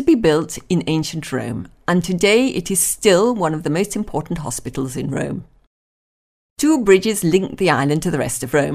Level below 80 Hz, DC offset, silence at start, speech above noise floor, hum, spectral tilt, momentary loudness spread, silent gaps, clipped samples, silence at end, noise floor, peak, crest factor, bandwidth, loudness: -44 dBFS; under 0.1%; 0 s; over 72 dB; none; -4.5 dB/octave; 10 LU; 5.67-6.56 s; under 0.1%; 0 s; under -90 dBFS; 0 dBFS; 18 dB; 16 kHz; -18 LUFS